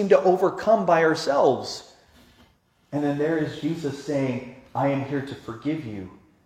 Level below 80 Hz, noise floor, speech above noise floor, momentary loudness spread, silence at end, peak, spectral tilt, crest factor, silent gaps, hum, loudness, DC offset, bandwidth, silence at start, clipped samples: -62 dBFS; -61 dBFS; 38 dB; 15 LU; 0.3 s; -4 dBFS; -6 dB/octave; 20 dB; none; none; -24 LUFS; under 0.1%; 14.5 kHz; 0 s; under 0.1%